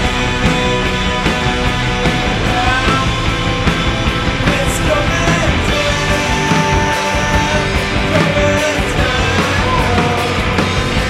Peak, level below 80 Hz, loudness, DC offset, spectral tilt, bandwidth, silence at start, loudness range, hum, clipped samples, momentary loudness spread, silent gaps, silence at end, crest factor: 0 dBFS; -22 dBFS; -14 LUFS; under 0.1%; -4.5 dB/octave; 15.5 kHz; 0 s; 1 LU; none; under 0.1%; 2 LU; none; 0 s; 14 dB